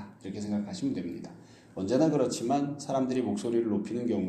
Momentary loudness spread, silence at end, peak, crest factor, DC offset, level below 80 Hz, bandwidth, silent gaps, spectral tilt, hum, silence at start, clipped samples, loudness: 14 LU; 0 s; -12 dBFS; 18 dB; under 0.1%; -68 dBFS; 12.5 kHz; none; -6.5 dB/octave; none; 0 s; under 0.1%; -30 LUFS